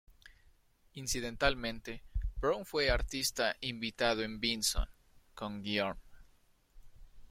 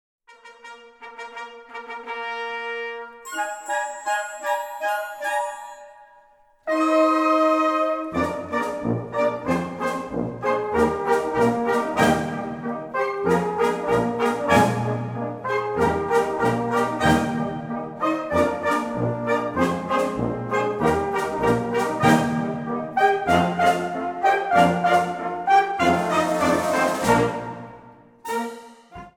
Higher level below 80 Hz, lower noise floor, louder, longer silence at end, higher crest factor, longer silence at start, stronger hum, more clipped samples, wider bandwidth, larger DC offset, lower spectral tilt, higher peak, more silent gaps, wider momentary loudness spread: first, -44 dBFS vs -50 dBFS; first, -67 dBFS vs -55 dBFS; second, -35 LUFS vs -22 LUFS; about the same, 0.05 s vs 0.05 s; about the same, 24 dB vs 20 dB; second, 0.1 s vs 0.3 s; neither; neither; second, 16.5 kHz vs 19 kHz; neither; second, -3 dB/octave vs -5.5 dB/octave; second, -12 dBFS vs -4 dBFS; neither; about the same, 12 LU vs 14 LU